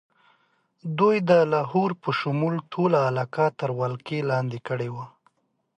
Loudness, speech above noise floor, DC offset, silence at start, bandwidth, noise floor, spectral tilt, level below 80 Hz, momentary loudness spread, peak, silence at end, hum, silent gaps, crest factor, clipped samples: -24 LUFS; 43 dB; under 0.1%; 0.85 s; 9 kHz; -67 dBFS; -8 dB/octave; -70 dBFS; 12 LU; -4 dBFS; 0.7 s; none; none; 20 dB; under 0.1%